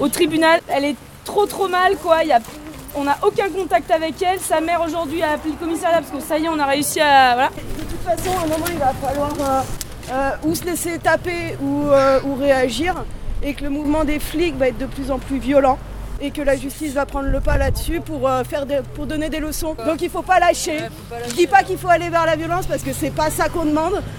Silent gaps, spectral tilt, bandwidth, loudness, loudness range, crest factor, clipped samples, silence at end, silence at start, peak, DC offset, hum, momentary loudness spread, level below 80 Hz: none; -4.5 dB/octave; over 20 kHz; -19 LUFS; 4 LU; 18 dB; under 0.1%; 0 s; 0 s; 0 dBFS; under 0.1%; none; 10 LU; -32 dBFS